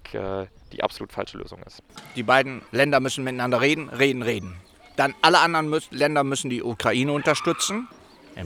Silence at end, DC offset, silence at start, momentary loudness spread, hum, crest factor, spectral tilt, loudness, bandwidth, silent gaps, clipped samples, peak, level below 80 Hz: 0 s; under 0.1%; 0.05 s; 15 LU; none; 24 dB; -4 dB/octave; -23 LUFS; 18.5 kHz; none; under 0.1%; 0 dBFS; -56 dBFS